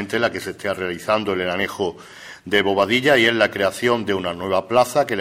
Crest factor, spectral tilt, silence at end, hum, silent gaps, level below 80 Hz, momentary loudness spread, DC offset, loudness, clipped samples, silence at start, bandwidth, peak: 18 dB; -4 dB/octave; 0 s; none; none; -58 dBFS; 11 LU; under 0.1%; -20 LUFS; under 0.1%; 0 s; 16 kHz; -2 dBFS